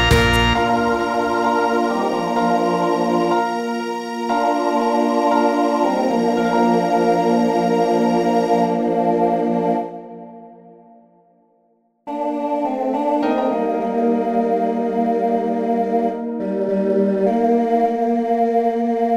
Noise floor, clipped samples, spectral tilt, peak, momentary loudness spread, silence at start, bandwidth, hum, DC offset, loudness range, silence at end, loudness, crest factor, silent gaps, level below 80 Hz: -61 dBFS; under 0.1%; -6 dB/octave; -2 dBFS; 6 LU; 0 s; 15.5 kHz; none; under 0.1%; 6 LU; 0 s; -18 LUFS; 16 dB; none; -38 dBFS